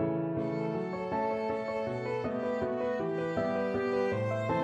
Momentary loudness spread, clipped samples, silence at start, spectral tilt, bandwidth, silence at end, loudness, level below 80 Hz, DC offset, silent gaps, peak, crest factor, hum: 3 LU; under 0.1%; 0 s; -8 dB/octave; 9.2 kHz; 0 s; -32 LUFS; -62 dBFS; under 0.1%; none; -20 dBFS; 12 dB; none